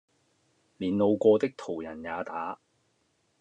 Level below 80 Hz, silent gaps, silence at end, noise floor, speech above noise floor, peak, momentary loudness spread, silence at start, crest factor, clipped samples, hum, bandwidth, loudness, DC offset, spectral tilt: -70 dBFS; none; 0.85 s; -72 dBFS; 45 dB; -10 dBFS; 14 LU; 0.8 s; 20 dB; under 0.1%; none; 8.6 kHz; -28 LUFS; under 0.1%; -7.5 dB/octave